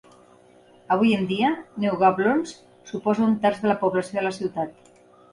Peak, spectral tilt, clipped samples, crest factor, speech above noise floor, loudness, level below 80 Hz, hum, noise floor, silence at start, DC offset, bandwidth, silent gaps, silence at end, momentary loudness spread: -6 dBFS; -6.5 dB/octave; under 0.1%; 18 dB; 31 dB; -23 LUFS; -66 dBFS; none; -53 dBFS; 0.9 s; under 0.1%; 11 kHz; none; 0.6 s; 9 LU